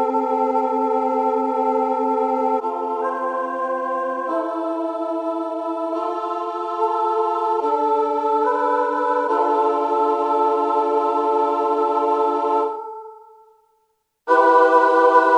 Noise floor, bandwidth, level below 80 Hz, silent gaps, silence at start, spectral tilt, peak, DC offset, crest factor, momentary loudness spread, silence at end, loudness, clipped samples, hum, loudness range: -68 dBFS; 9.8 kHz; -72 dBFS; none; 0 s; -4 dB/octave; -2 dBFS; under 0.1%; 18 dB; 10 LU; 0 s; -20 LUFS; under 0.1%; none; 5 LU